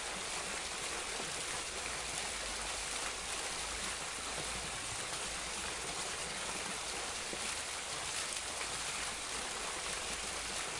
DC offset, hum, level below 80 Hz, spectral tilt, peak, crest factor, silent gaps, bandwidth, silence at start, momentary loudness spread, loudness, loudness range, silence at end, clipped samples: under 0.1%; none; -58 dBFS; -0.5 dB/octave; -22 dBFS; 18 dB; none; 11.5 kHz; 0 s; 1 LU; -38 LUFS; 0 LU; 0 s; under 0.1%